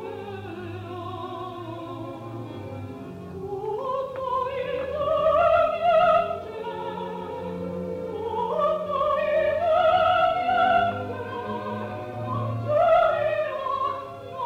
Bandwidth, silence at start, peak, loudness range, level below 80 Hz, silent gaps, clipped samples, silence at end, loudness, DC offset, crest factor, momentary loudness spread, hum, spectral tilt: 8.2 kHz; 0 s; -10 dBFS; 11 LU; -54 dBFS; none; under 0.1%; 0 s; -25 LUFS; under 0.1%; 16 dB; 16 LU; none; -7 dB/octave